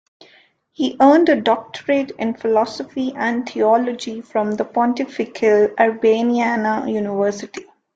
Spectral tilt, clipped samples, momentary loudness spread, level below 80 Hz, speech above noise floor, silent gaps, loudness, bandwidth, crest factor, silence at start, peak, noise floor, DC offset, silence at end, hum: -5.5 dB/octave; under 0.1%; 10 LU; -64 dBFS; 36 dB; none; -18 LUFS; 7.8 kHz; 16 dB; 0.8 s; -2 dBFS; -54 dBFS; under 0.1%; 0.35 s; none